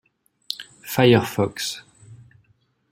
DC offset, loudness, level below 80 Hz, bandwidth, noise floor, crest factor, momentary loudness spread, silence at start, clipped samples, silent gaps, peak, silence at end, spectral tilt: under 0.1%; -21 LUFS; -60 dBFS; 16.5 kHz; -64 dBFS; 22 dB; 16 LU; 0.5 s; under 0.1%; none; -2 dBFS; 0.75 s; -5 dB/octave